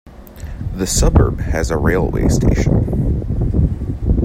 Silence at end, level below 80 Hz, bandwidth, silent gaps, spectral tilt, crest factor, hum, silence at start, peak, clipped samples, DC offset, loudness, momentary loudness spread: 0 s; -20 dBFS; 16 kHz; none; -6 dB/octave; 16 dB; none; 0.05 s; 0 dBFS; under 0.1%; under 0.1%; -17 LUFS; 10 LU